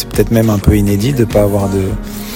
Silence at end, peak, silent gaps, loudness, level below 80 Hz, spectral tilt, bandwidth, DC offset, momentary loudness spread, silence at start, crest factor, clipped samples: 0 s; 0 dBFS; none; -13 LUFS; -24 dBFS; -7 dB/octave; 17 kHz; under 0.1%; 6 LU; 0 s; 12 dB; 0.4%